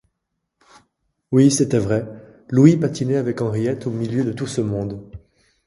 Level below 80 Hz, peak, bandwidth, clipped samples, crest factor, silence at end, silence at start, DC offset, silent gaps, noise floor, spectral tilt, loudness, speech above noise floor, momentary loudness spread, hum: -50 dBFS; 0 dBFS; 11.5 kHz; under 0.1%; 20 dB; 0.5 s; 1.3 s; under 0.1%; none; -77 dBFS; -6.5 dB/octave; -19 LUFS; 58 dB; 11 LU; none